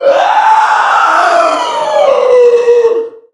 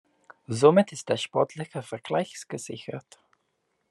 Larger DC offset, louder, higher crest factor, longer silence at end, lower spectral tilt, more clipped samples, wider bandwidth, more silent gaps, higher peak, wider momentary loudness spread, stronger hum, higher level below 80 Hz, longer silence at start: neither; first, -8 LUFS vs -26 LUFS; second, 8 dB vs 24 dB; second, 0.2 s vs 0.9 s; second, -1.5 dB/octave vs -5.5 dB/octave; first, 0.3% vs under 0.1%; about the same, 11.5 kHz vs 12 kHz; neither; first, 0 dBFS vs -4 dBFS; second, 5 LU vs 17 LU; neither; first, -60 dBFS vs -74 dBFS; second, 0 s vs 0.5 s